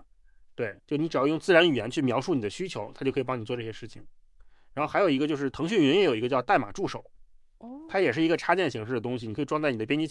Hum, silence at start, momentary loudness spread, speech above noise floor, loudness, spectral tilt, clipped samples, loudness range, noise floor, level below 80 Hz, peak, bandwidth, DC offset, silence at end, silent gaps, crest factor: none; 0.6 s; 13 LU; 29 dB; -27 LUFS; -5.5 dB/octave; under 0.1%; 4 LU; -55 dBFS; -58 dBFS; -6 dBFS; 11.5 kHz; under 0.1%; 0 s; none; 22 dB